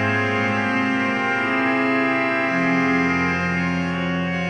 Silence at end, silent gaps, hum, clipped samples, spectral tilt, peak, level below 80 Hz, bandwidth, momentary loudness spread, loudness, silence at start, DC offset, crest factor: 0 s; none; none; under 0.1%; -6.5 dB/octave; -8 dBFS; -52 dBFS; 9.6 kHz; 4 LU; -20 LUFS; 0 s; under 0.1%; 12 dB